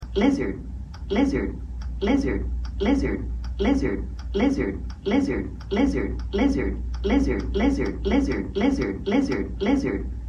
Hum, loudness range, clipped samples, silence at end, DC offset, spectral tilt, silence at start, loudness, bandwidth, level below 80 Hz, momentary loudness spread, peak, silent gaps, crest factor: none; 2 LU; under 0.1%; 0 s; under 0.1%; -7 dB/octave; 0 s; -25 LUFS; 9.8 kHz; -32 dBFS; 8 LU; -8 dBFS; none; 16 dB